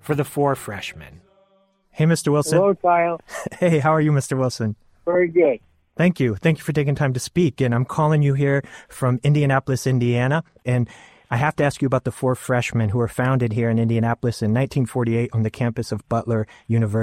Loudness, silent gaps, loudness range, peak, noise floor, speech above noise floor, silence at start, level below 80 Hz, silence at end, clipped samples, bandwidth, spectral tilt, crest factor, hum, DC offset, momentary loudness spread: -21 LUFS; none; 2 LU; -4 dBFS; -61 dBFS; 41 dB; 0.05 s; -52 dBFS; 0 s; under 0.1%; 16 kHz; -7 dB/octave; 16 dB; none; under 0.1%; 8 LU